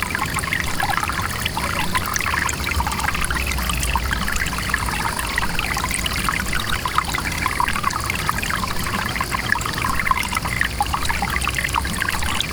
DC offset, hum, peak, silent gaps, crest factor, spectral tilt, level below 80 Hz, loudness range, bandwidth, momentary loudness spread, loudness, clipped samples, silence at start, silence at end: 0.5%; none; -4 dBFS; none; 18 dB; -3 dB/octave; -30 dBFS; 1 LU; over 20 kHz; 2 LU; -21 LUFS; under 0.1%; 0 s; 0 s